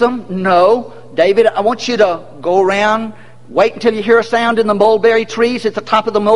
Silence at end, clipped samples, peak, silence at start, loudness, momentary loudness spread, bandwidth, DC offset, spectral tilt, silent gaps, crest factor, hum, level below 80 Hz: 0 s; under 0.1%; 0 dBFS; 0 s; -13 LUFS; 8 LU; 11 kHz; 2%; -5 dB/octave; none; 12 dB; none; -52 dBFS